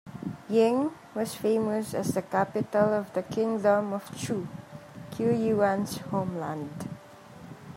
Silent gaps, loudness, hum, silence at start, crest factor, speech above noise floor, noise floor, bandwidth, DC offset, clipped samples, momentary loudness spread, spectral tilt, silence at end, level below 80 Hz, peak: none; -28 LUFS; none; 0.05 s; 18 dB; 21 dB; -48 dBFS; 16 kHz; under 0.1%; under 0.1%; 16 LU; -6.5 dB/octave; 0 s; -66 dBFS; -10 dBFS